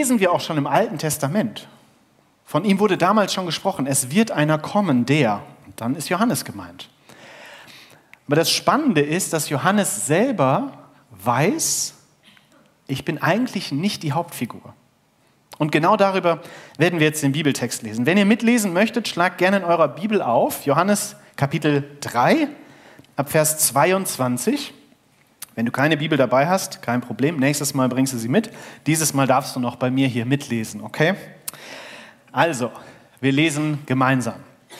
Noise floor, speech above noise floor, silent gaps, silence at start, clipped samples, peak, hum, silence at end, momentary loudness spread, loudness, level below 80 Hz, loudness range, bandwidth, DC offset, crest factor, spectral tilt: -60 dBFS; 40 dB; none; 0 s; under 0.1%; -2 dBFS; none; 0 s; 13 LU; -20 LUFS; -68 dBFS; 5 LU; 16 kHz; under 0.1%; 18 dB; -4.5 dB/octave